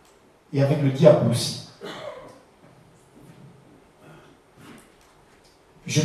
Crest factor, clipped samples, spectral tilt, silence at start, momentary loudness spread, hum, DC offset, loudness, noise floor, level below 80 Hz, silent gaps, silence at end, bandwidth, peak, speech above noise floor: 26 dB; under 0.1%; -6 dB/octave; 0.5 s; 23 LU; none; under 0.1%; -21 LUFS; -56 dBFS; -64 dBFS; none; 0 s; 13.5 kHz; 0 dBFS; 37 dB